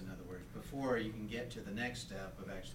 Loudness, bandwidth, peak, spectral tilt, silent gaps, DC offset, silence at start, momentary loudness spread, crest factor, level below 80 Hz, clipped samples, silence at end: -43 LUFS; 16.5 kHz; -24 dBFS; -5.5 dB/octave; none; under 0.1%; 0 s; 11 LU; 20 dB; -56 dBFS; under 0.1%; 0 s